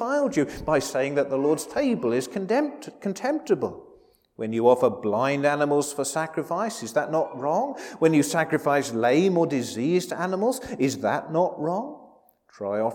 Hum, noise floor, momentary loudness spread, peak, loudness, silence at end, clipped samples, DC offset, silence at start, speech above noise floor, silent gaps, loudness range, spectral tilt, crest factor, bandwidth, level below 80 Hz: none; -56 dBFS; 8 LU; -6 dBFS; -25 LUFS; 0 s; under 0.1%; under 0.1%; 0 s; 32 dB; none; 3 LU; -5.5 dB/octave; 18 dB; 18 kHz; -60 dBFS